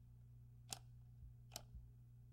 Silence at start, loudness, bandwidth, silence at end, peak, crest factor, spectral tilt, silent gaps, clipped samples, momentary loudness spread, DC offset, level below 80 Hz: 0 s; -58 LUFS; 16 kHz; 0 s; -26 dBFS; 32 dB; -3 dB/octave; none; under 0.1%; 10 LU; under 0.1%; -66 dBFS